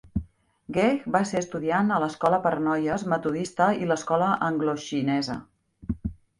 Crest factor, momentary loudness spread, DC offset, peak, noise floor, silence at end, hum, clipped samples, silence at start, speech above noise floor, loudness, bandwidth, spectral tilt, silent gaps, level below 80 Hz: 18 dB; 10 LU; under 0.1%; -8 dBFS; -46 dBFS; 0.25 s; none; under 0.1%; 0.05 s; 22 dB; -26 LUFS; 11.5 kHz; -6 dB/octave; none; -48 dBFS